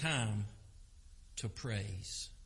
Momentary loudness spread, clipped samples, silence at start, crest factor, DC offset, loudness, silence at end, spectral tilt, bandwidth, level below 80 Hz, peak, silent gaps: 16 LU; under 0.1%; 0 s; 18 dB; under 0.1%; -41 LUFS; 0 s; -4 dB/octave; 11.5 kHz; -56 dBFS; -24 dBFS; none